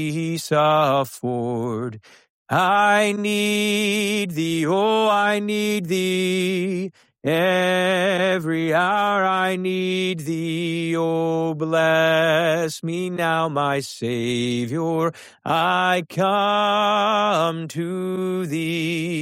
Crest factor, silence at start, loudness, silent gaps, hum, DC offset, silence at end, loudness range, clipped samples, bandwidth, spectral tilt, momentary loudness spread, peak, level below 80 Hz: 14 dB; 0 s; -21 LUFS; 2.29-2.46 s; none; under 0.1%; 0 s; 2 LU; under 0.1%; 16 kHz; -5 dB/octave; 8 LU; -6 dBFS; -66 dBFS